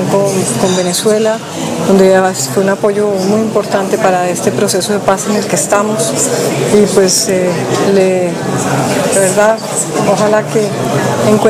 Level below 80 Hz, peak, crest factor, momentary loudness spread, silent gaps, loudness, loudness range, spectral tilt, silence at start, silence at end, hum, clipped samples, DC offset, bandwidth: -50 dBFS; 0 dBFS; 12 dB; 5 LU; none; -11 LUFS; 1 LU; -4 dB/octave; 0 s; 0 s; none; 0.2%; under 0.1%; 16 kHz